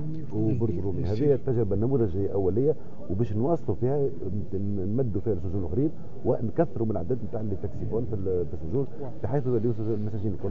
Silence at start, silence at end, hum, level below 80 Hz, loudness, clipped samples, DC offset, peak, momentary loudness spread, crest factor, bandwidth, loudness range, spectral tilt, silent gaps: 0 s; 0 s; none; -44 dBFS; -28 LUFS; under 0.1%; 4%; -10 dBFS; 7 LU; 18 dB; 7 kHz; 3 LU; -11.5 dB/octave; none